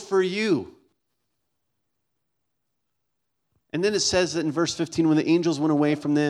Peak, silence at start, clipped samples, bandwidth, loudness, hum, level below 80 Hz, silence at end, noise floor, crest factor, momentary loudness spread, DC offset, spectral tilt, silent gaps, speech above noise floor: -8 dBFS; 0 s; under 0.1%; 11.5 kHz; -23 LUFS; none; -60 dBFS; 0 s; -81 dBFS; 18 dB; 5 LU; under 0.1%; -4.5 dB/octave; none; 58 dB